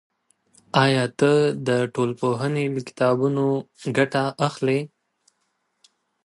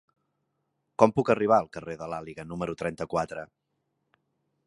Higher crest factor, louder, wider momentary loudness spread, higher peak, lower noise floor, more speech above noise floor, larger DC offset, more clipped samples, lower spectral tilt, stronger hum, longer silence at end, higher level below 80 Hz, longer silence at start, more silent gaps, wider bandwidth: second, 20 dB vs 26 dB; first, -22 LUFS vs -27 LUFS; second, 7 LU vs 15 LU; about the same, -4 dBFS vs -2 dBFS; second, -73 dBFS vs -78 dBFS; about the same, 51 dB vs 51 dB; neither; neither; about the same, -6 dB/octave vs -7 dB/octave; neither; first, 1.4 s vs 1.2 s; second, -68 dBFS vs -60 dBFS; second, 0.75 s vs 1 s; neither; about the same, 11.5 kHz vs 11.5 kHz